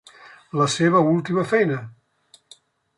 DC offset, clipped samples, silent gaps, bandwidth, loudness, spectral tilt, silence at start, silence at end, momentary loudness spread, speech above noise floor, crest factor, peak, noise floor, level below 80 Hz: under 0.1%; under 0.1%; none; 11.5 kHz; -20 LUFS; -5.5 dB/octave; 0.55 s; 1.05 s; 13 LU; 37 dB; 18 dB; -6 dBFS; -57 dBFS; -66 dBFS